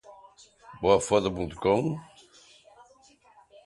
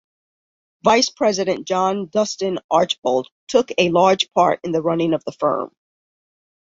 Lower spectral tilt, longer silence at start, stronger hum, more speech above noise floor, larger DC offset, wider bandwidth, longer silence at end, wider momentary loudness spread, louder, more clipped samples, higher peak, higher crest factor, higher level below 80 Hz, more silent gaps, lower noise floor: first, -5.5 dB/octave vs -4 dB/octave; second, 0.1 s vs 0.85 s; neither; second, 34 dB vs over 71 dB; neither; first, 11.5 kHz vs 7.8 kHz; first, 1.6 s vs 0.95 s; first, 10 LU vs 6 LU; second, -26 LUFS vs -19 LUFS; neither; second, -6 dBFS vs -2 dBFS; about the same, 22 dB vs 18 dB; first, -54 dBFS vs -60 dBFS; second, none vs 2.64-2.69 s, 2.98-3.02 s, 3.32-3.47 s; second, -59 dBFS vs under -90 dBFS